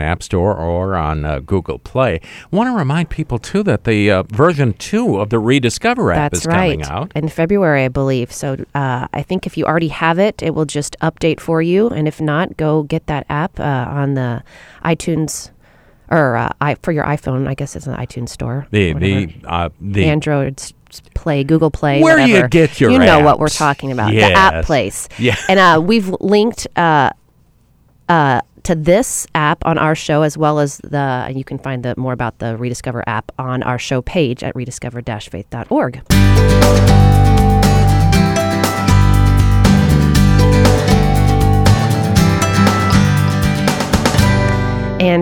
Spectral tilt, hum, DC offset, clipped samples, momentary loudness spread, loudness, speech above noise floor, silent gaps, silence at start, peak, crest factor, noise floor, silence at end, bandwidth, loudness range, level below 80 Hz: -6 dB/octave; none; under 0.1%; under 0.1%; 12 LU; -14 LUFS; 37 dB; none; 0 s; 0 dBFS; 14 dB; -52 dBFS; 0 s; 17 kHz; 7 LU; -24 dBFS